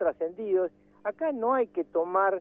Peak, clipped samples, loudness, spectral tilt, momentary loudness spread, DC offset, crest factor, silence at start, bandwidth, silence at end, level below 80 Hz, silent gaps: -12 dBFS; under 0.1%; -29 LUFS; -9.5 dB/octave; 9 LU; under 0.1%; 16 dB; 0 s; 3.7 kHz; 0 s; -70 dBFS; none